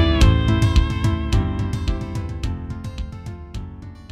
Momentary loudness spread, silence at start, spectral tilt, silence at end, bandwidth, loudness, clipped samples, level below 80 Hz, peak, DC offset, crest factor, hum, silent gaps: 18 LU; 0 s; -6.5 dB/octave; 0.05 s; 12.5 kHz; -21 LUFS; under 0.1%; -24 dBFS; -2 dBFS; under 0.1%; 18 dB; none; none